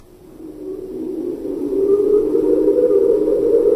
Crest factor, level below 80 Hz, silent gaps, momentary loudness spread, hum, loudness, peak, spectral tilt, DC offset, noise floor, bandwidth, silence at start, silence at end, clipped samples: 12 dB; -44 dBFS; none; 16 LU; none; -17 LUFS; -4 dBFS; -8.5 dB/octave; under 0.1%; -38 dBFS; 12 kHz; 0.35 s; 0 s; under 0.1%